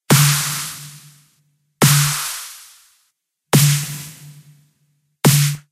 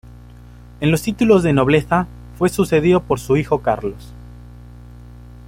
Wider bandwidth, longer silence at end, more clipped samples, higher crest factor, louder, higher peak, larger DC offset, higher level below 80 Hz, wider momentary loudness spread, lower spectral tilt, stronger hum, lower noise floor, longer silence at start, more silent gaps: about the same, 16 kHz vs 16.5 kHz; second, 0.15 s vs 1.1 s; neither; about the same, 20 dB vs 16 dB; about the same, -16 LUFS vs -17 LUFS; about the same, 0 dBFS vs -2 dBFS; neither; second, -56 dBFS vs -38 dBFS; first, 21 LU vs 12 LU; second, -4 dB/octave vs -6.5 dB/octave; second, none vs 60 Hz at -35 dBFS; first, -69 dBFS vs -40 dBFS; second, 0.1 s vs 0.8 s; neither